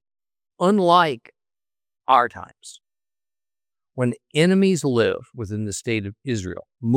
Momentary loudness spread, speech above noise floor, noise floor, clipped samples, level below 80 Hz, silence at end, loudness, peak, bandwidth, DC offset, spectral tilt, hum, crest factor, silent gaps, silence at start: 17 LU; over 69 dB; under -90 dBFS; under 0.1%; -64 dBFS; 0 s; -21 LUFS; -2 dBFS; 15 kHz; under 0.1%; -5.5 dB/octave; none; 20 dB; none; 0.6 s